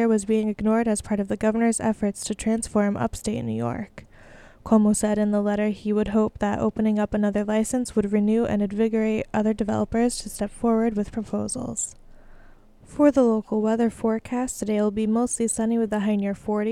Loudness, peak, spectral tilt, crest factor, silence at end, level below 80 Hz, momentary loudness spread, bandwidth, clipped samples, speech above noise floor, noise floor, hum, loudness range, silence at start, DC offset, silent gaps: -24 LUFS; -6 dBFS; -5.5 dB/octave; 18 dB; 0 s; -48 dBFS; 7 LU; 13.5 kHz; under 0.1%; 26 dB; -49 dBFS; none; 3 LU; 0 s; under 0.1%; none